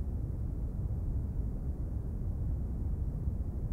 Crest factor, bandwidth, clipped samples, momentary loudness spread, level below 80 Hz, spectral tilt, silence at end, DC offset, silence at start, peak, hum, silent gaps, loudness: 12 dB; 2.1 kHz; under 0.1%; 2 LU; -36 dBFS; -11 dB/octave; 0 s; under 0.1%; 0 s; -22 dBFS; none; none; -37 LUFS